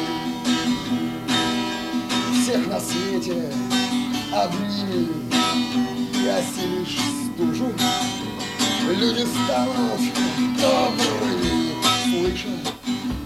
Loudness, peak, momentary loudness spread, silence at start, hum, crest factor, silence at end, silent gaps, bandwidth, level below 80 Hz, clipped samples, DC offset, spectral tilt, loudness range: -22 LUFS; -6 dBFS; 6 LU; 0 s; none; 16 dB; 0 s; none; 16 kHz; -46 dBFS; under 0.1%; under 0.1%; -3.5 dB/octave; 2 LU